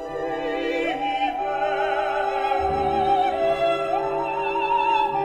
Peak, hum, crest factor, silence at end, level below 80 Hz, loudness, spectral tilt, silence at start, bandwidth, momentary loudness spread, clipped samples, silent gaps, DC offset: -10 dBFS; none; 12 dB; 0 s; -48 dBFS; -23 LUFS; -5 dB/octave; 0 s; 11 kHz; 5 LU; under 0.1%; none; under 0.1%